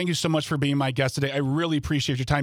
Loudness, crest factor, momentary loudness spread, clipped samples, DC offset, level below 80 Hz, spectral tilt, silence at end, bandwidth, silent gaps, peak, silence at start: -25 LUFS; 16 dB; 1 LU; under 0.1%; under 0.1%; -46 dBFS; -5.5 dB/octave; 0 s; 15.5 kHz; none; -8 dBFS; 0 s